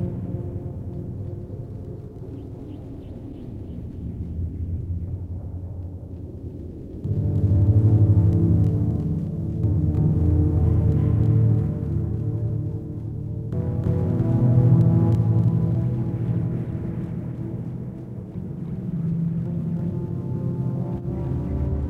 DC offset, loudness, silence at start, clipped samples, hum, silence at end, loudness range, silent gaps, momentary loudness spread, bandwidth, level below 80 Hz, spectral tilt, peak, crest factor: under 0.1%; -23 LUFS; 0 s; under 0.1%; none; 0 s; 13 LU; none; 17 LU; 2.6 kHz; -36 dBFS; -12 dB/octave; -6 dBFS; 16 dB